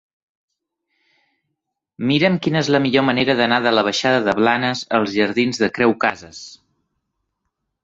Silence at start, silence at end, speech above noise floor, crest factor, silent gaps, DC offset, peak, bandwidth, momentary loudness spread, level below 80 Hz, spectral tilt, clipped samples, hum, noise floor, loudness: 2 s; 1.3 s; 61 dB; 20 dB; none; under 0.1%; 0 dBFS; 7.8 kHz; 5 LU; -58 dBFS; -5 dB/octave; under 0.1%; none; -78 dBFS; -17 LUFS